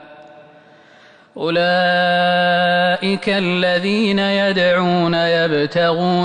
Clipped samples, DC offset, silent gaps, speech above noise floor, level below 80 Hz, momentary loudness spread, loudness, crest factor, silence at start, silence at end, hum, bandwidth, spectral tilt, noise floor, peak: under 0.1%; under 0.1%; none; 31 dB; -56 dBFS; 3 LU; -16 LUFS; 10 dB; 0 s; 0 s; none; 10 kHz; -6 dB/octave; -47 dBFS; -6 dBFS